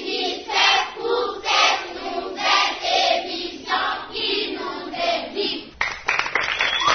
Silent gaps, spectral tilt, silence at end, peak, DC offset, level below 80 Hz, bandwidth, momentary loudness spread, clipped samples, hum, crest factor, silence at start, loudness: none; -1 dB/octave; 0 s; -2 dBFS; under 0.1%; -54 dBFS; 6.6 kHz; 10 LU; under 0.1%; none; 20 dB; 0 s; -21 LUFS